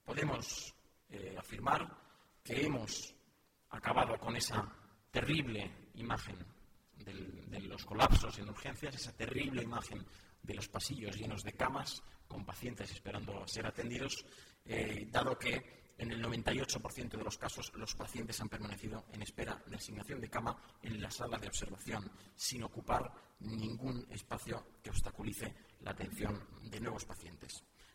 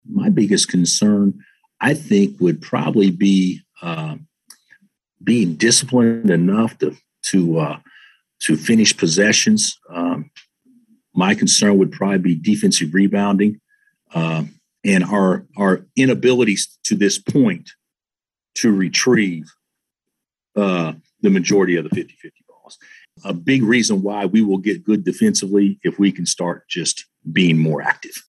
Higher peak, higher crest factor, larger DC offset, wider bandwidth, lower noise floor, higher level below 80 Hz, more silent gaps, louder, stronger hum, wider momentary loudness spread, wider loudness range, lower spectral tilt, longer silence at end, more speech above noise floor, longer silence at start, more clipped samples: second, -12 dBFS vs 0 dBFS; first, 28 dB vs 16 dB; neither; first, 16 kHz vs 12.5 kHz; second, -72 dBFS vs under -90 dBFS; first, -50 dBFS vs -68 dBFS; neither; second, -41 LUFS vs -17 LUFS; neither; about the same, 14 LU vs 12 LU; about the same, 5 LU vs 3 LU; about the same, -4 dB/octave vs -4.5 dB/octave; about the same, 0.05 s vs 0.1 s; second, 31 dB vs over 73 dB; about the same, 0.05 s vs 0.1 s; neither